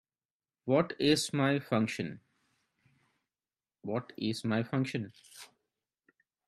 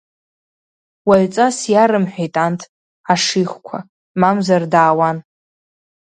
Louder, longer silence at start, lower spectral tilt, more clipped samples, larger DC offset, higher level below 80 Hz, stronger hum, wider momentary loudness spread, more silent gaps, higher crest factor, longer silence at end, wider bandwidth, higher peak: second, -32 LUFS vs -15 LUFS; second, 0.65 s vs 1.05 s; about the same, -5.5 dB/octave vs -5 dB/octave; neither; neither; second, -72 dBFS vs -60 dBFS; neither; first, 18 LU vs 15 LU; second, none vs 2.69-3.04 s, 3.89-4.15 s; first, 22 dB vs 16 dB; first, 1 s vs 0.8 s; first, 13.5 kHz vs 9.8 kHz; second, -14 dBFS vs 0 dBFS